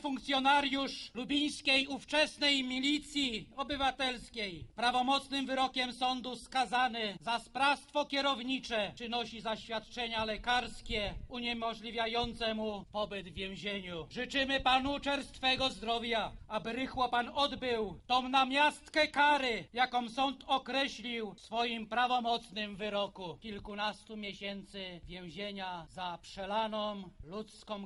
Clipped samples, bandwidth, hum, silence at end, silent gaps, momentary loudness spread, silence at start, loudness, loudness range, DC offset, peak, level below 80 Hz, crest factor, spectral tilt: under 0.1%; 11.5 kHz; none; 0 s; none; 13 LU; 0 s; -34 LUFS; 9 LU; under 0.1%; -16 dBFS; -58 dBFS; 20 dB; -3.5 dB/octave